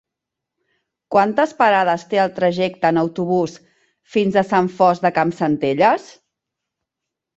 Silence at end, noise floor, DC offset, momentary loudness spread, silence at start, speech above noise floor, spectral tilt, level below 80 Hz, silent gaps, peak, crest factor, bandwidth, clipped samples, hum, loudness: 1.35 s; -83 dBFS; under 0.1%; 5 LU; 1.1 s; 66 dB; -6.5 dB/octave; -62 dBFS; none; -2 dBFS; 18 dB; 8 kHz; under 0.1%; none; -18 LUFS